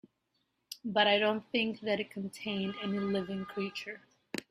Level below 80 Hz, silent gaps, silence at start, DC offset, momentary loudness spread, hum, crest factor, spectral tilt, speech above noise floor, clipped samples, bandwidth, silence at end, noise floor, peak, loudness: -72 dBFS; none; 0.7 s; under 0.1%; 16 LU; none; 22 dB; -5 dB/octave; 47 dB; under 0.1%; 14.5 kHz; 0.1 s; -79 dBFS; -12 dBFS; -33 LUFS